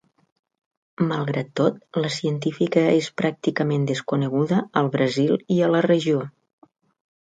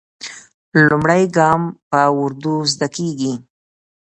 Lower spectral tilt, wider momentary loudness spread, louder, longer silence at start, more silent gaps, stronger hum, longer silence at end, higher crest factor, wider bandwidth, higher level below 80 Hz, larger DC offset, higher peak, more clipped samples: first, -6.5 dB/octave vs -5 dB/octave; second, 6 LU vs 16 LU; second, -22 LUFS vs -16 LUFS; first, 1 s vs 0.2 s; second, none vs 0.54-0.72 s, 1.82-1.91 s; neither; first, 0.95 s vs 0.75 s; about the same, 18 dB vs 18 dB; about the same, 9.4 kHz vs 9 kHz; second, -66 dBFS vs -54 dBFS; neither; second, -4 dBFS vs 0 dBFS; neither